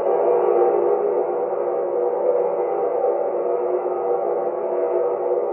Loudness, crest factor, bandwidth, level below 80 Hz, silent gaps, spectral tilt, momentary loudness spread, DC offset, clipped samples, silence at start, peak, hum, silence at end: -21 LUFS; 14 dB; 3 kHz; -88 dBFS; none; -11.5 dB/octave; 5 LU; under 0.1%; under 0.1%; 0 s; -6 dBFS; none; 0 s